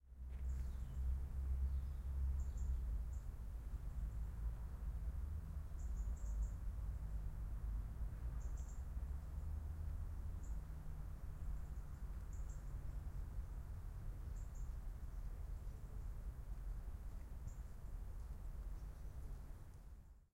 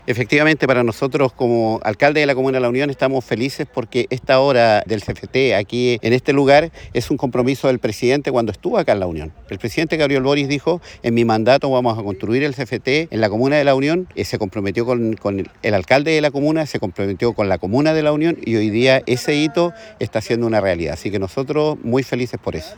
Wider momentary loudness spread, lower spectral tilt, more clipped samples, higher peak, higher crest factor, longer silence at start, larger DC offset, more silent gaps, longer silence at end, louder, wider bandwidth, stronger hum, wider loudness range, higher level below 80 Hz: about the same, 8 LU vs 9 LU; first, -7.5 dB/octave vs -6 dB/octave; neither; second, -32 dBFS vs 0 dBFS; about the same, 14 dB vs 16 dB; about the same, 0.05 s vs 0.1 s; neither; neither; about the same, 0.1 s vs 0.05 s; second, -50 LUFS vs -18 LUFS; second, 15.5 kHz vs over 20 kHz; neither; first, 7 LU vs 2 LU; about the same, -46 dBFS vs -48 dBFS